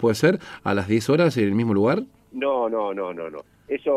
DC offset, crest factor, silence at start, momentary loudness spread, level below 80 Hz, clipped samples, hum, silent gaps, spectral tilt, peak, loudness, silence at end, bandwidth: under 0.1%; 16 dB; 0 s; 13 LU; -62 dBFS; under 0.1%; 50 Hz at -50 dBFS; none; -6.5 dB/octave; -6 dBFS; -22 LUFS; 0 s; 15 kHz